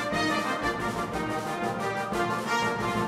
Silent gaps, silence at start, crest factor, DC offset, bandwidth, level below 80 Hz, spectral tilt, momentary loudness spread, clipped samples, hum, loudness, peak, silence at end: none; 0 s; 14 dB; under 0.1%; 16 kHz; -52 dBFS; -4.5 dB/octave; 4 LU; under 0.1%; none; -28 LUFS; -14 dBFS; 0 s